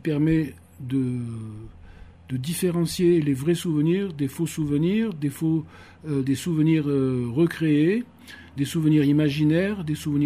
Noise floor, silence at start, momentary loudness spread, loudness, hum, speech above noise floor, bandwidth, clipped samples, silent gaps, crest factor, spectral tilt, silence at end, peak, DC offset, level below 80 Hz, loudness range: -45 dBFS; 0.05 s; 13 LU; -24 LUFS; none; 22 dB; 15.5 kHz; under 0.1%; none; 14 dB; -7 dB/octave; 0 s; -10 dBFS; under 0.1%; -54 dBFS; 3 LU